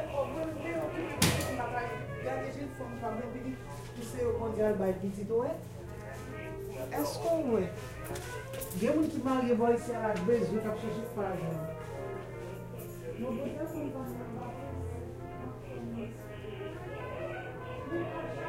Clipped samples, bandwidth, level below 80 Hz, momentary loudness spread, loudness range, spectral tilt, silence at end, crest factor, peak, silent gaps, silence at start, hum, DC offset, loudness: under 0.1%; 16 kHz; -54 dBFS; 13 LU; 9 LU; -5.5 dB/octave; 0 s; 26 dB; -8 dBFS; none; 0 s; none; under 0.1%; -35 LUFS